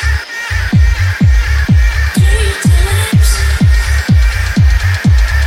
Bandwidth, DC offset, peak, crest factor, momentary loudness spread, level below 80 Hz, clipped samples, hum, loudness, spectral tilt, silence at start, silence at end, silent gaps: 16 kHz; under 0.1%; 0 dBFS; 8 dB; 2 LU; -12 dBFS; under 0.1%; none; -11 LUFS; -5 dB/octave; 0 s; 0 s; none